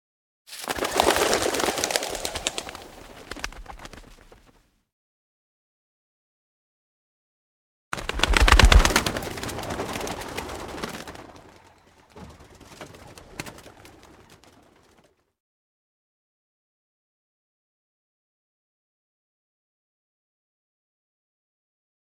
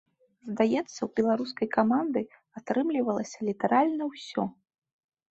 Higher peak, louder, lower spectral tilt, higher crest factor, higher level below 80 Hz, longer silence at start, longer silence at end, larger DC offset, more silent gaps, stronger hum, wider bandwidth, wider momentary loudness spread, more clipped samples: first, 0 dBFS vs -10 dBFS; first, -24 LUFS vs -28 LUFS; second, -3 dB/octave vs -6 dB/octave; first, 28 dB vs 20 dB; first, -32 dBFS vs -70 dBFS; about the same, 0.5 s vs 0.45 s; first, 8.15 s vs 0.8 s; neither; first, 4.92-7.91 s vs none; neither; first, 18 kHz vs 8 kHz; first, 27 LU vs 10 LU; neither